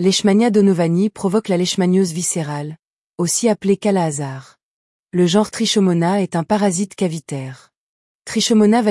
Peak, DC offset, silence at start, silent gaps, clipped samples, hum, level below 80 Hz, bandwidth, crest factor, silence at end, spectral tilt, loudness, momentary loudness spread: -4 dBFS; under 0.1%; 0 s; 2.85-3.14 s, 4.63-5.06 s, 7.77-8.25 s; under 0.1%; none; -62 dBFS; 12 kHz; 14 dB; 0 s; -5 dB/octave; -17 LUFS; 13 LU